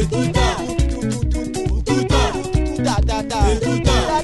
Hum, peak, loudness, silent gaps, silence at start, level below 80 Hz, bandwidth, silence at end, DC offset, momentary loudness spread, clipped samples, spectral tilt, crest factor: none; -2 dBFS; -19 LUFS; none; 0 s; -22 dBFS; 12 kHz; 0 s; under 0.1%; 5 LU; under 0.1%; -5.5 dB/octave; 16 dB